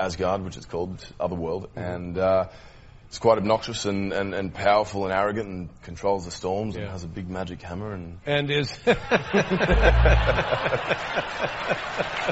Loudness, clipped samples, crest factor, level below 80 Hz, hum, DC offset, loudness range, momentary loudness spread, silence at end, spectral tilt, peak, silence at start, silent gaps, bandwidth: -25 LUFS; under 0.1%; 22 dB; -32 dBFS; none; under 0.1%; 6 LU; 13 LU; 0 s; -4 dB/octave; -4 dBFS; 0 s; none; 8 kHz